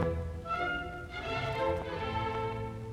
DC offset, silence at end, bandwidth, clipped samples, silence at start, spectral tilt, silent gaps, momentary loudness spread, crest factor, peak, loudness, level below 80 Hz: under 0.1%; 0 s; 14 kHz; under 0.1%; 0 s; -6.5 dB/octave; none; 6 LU; 16 dB; -18 dBFS; -35 LUFS; -48 dBFS